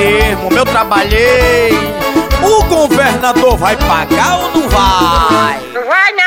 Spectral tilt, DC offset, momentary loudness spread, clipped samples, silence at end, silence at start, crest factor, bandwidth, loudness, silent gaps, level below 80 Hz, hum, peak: -4.5 dB/octave; 0.3%; 4 LU; under 0.1%; 0 s; 0 s; 10 dB; 16.5 kHz; -10 LUFS; none; -20 dBFS; none; 0 dBFS